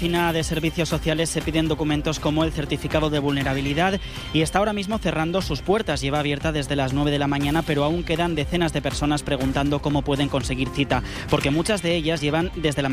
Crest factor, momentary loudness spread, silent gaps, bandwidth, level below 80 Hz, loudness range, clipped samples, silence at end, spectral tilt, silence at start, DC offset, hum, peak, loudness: 16 dB; 3 LU; none; 15.5 kHz; -36 dBFS; 0 LU; under 0.1%; 0 s; -5.5 dB/octave; 0 s; under 0.1%; none; -6 dBFS; -23 LUFS